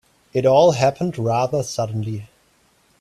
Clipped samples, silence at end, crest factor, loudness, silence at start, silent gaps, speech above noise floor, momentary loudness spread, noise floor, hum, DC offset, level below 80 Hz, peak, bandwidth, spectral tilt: under 0.1%; 0.75 s; 18 dB; -19 LUFS; 0.35 s; none; 41 dB; 13 LU; -59 dBFS; none; under 0.1%; -56 dBFS; -2 dBFS; 13 kHz; -6 dB/octave